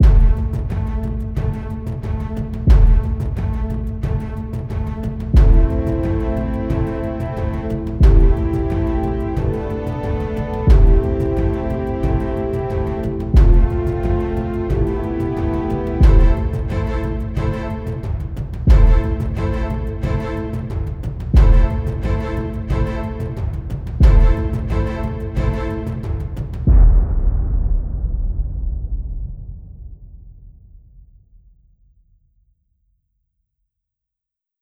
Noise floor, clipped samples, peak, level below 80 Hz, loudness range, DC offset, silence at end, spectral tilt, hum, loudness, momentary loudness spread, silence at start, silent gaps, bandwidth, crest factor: -85 dBFS; under 0.1%; 0 dBFS; -18 dBFS; 2 LU; under 0.1%; 4.15 s; -9.5 dB/octave; none; -20 LUFS; 11 LU; 0 s; none; 5.2 kHz; 16 dB